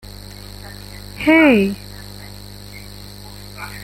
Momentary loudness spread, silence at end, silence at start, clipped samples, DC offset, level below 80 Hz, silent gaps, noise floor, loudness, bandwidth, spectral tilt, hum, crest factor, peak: 24 LU; 0 s; 0.65 s; under 0.1%; under 0.1%; -42 dBFS; none; -36 dBFS; -14 LUFS; 16.5 kHz; -5.5 dB/octave; 50 Hz at -35 dBFS; 20 dB; -2 dBFS